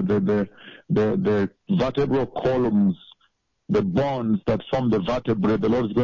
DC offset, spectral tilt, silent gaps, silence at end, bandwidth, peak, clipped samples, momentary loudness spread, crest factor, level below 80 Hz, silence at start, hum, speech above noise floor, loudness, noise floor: under 0.1%; -8.5 dB/octave; none; 0 s; 7.2 kHz; -12 dBFS; under 0.1%; 4 LU; 10 dB; -48 dBFS; 0 s; none; 45 dB; -23 LUFS; -67 dBFS